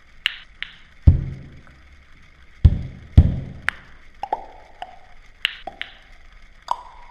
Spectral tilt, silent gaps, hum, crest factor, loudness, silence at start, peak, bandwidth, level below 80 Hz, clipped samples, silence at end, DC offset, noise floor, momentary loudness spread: -7 dB/octave; none; none; 22 dB; -22 LUFS; 0.25 s; 0 dBFS; 8.4 kHz; -28 dBFS; under 0.1%; 0.35 s; under 0.1%; -47 dBFS; 22 LU